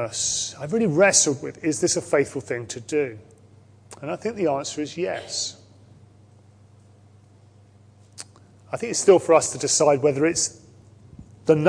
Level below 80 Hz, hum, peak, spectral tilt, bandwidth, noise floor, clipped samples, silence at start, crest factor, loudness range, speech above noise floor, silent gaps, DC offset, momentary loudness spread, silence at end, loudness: -62 dBFS; none; -4 dBFS; -3.5 dB/octave; 10.5 kHz; -52 dBFS; under 0.1%; 0 s; 20 dB; 12 LU; 30 dB; none; under 0.1%; 15 LU; 0 s; -22 LUFS